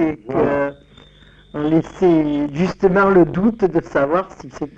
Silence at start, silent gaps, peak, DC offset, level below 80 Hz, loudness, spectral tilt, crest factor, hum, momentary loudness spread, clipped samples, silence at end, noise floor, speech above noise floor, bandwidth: 0 s; none; -2 dBFS; under 0.1%; -44 dBFS; -17 LUFS; -8.5 dB/octave; 14 dB; none; 11 LU; under 0.1%; 0.1 s; -47 dBFS; 30 dB; 7.6 kHz